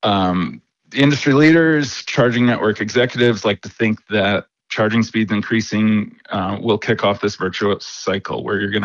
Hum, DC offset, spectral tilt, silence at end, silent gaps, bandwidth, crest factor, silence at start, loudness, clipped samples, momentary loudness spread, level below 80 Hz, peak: none; under 0.1%; -5.5 dB/octave; 0 s; none; 7.6 kHz; 14 dB; 0.05 s; -17 LUFS; under 0.1%; 9 LU; -56 dBFS; -4 dBFS